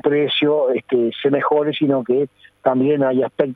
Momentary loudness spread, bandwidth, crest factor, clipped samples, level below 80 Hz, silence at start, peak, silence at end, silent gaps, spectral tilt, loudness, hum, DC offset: 4 LU; 4.1 kHz; 14 dB; under 0.1%; -68 dBFS; 0.05 s; -2 dBFS; 0 s; none; -8.5 dB/octave; -18 LUFS; none; under 0.1%